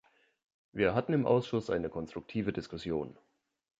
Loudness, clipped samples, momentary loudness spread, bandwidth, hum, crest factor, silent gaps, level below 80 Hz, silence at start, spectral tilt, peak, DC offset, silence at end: -33 LUFS; under 0.1%; 12 LU; 7.8 kHz; none; 20 dB; none; -60 dBFS; 0.75 s; -7.5 dB/octave; -14 dBFS; under 0.1%; 0.7 s